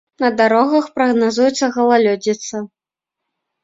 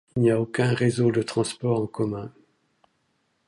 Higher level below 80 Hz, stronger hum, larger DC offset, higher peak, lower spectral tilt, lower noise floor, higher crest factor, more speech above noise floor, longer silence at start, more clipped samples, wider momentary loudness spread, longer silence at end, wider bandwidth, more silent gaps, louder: about the same, -62 dBFS vs -60 dBFS; neither; neither; first, 0 dBFS vs -8 dBFS; second, -4 dB/octave vs -6.5 dB/octave; first, -83 dBFS vs -71 dBFS; about the same, 16 dB vs 16 dB; first, 68 dB vs 48 dB; about the same, 0.2 s vs 0.15 s; neither; first, 11 LU vs 7 LU; second, 0.95 s vs 1.2 s; second, 7.8 kHz vs 11.5 kHz; neither; first, -15 LUFS vs -24 LUFS